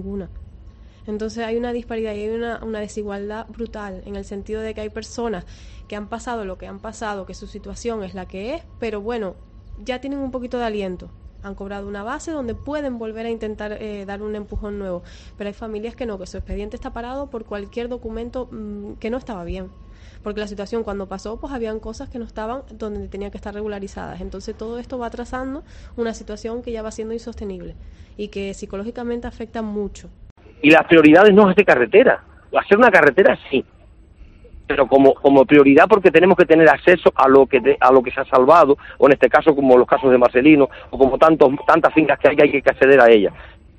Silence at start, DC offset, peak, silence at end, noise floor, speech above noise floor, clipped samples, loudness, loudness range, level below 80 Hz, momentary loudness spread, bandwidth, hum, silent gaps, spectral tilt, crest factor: 0 s; under 0.1%; 0 dBFS; 0.3 s; -45 dBFS; 27 dB; under 0.1%; -16 LUFS; 17 LU; -42 dBFS; 20 LU; 8.8 kHz; none; 30.31-30.36 s; -6.5 dB/octave; 18 dB